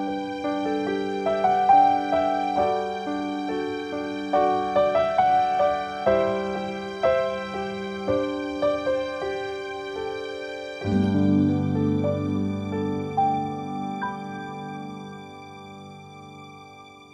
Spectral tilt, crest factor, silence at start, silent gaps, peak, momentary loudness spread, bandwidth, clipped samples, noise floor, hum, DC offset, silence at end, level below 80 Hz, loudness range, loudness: -7 dB/octave; 18 dB; 0 s; none; -8 dBFS; 18 LU; 10 kHz; under 0.1%; -46 dBFS; none; under 0.1%; 0.1 s; -56 dBFS; 7 LU; -25 LUFS